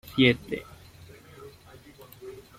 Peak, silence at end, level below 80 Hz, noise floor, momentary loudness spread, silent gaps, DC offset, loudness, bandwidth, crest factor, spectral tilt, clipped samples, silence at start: -6 dBFS; 0.2 s; -58 dBFS; -51 dBFS; 28 LU; none; under 0.1%; -25 LUFS; 15.5 kHz; 24 dB; -6 dB/octave; under 0.1%; 0.15 s